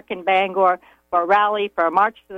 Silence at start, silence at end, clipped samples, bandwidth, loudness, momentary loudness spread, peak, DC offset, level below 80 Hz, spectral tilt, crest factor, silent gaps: 0.1 s; 0 s; under 0.1%; 6.8 kHz; -19 LUFS; 6 LU; -4 dBFS; under 0.1%; -64 dBFS; -5.5 dB/octave; 14 dB; none